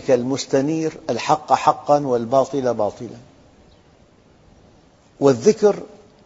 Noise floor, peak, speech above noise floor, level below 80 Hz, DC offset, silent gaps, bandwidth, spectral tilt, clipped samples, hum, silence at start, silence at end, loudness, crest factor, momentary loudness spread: -52 dBFS; 0 dBFS; 34 dB; -58 dBFS; under 0.1%; none; 8 kHz; -5.5 dB/octave; under 0.1%; none; 0 s; 0.4 s; -19 LUFS; 20 dB; 9 LU